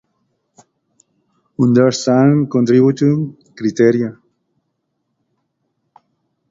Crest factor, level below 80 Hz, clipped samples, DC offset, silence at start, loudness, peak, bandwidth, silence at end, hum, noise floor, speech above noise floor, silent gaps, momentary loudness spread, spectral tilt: 16 dB; -58 dBFS; under 0.1%; under 0.1%; 1.6 s; -14 LUFS; 0 dBFS; 7.8 kHz; 2.35 s; none; -71 dBFS; 58 dB; none; 11 LU; -7 dB/octave